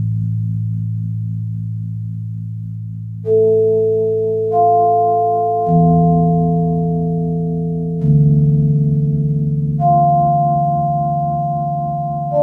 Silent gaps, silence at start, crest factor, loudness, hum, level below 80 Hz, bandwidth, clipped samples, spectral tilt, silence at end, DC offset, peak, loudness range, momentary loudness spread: none; 0 s; 14 dB; -16 LUFS; none; -40 dBFS; 1.5 kHz; under 0.1%; -13.5 dB/octave; 0 s; under 0.1%; -2 dBFS; 5 LU; 12 LU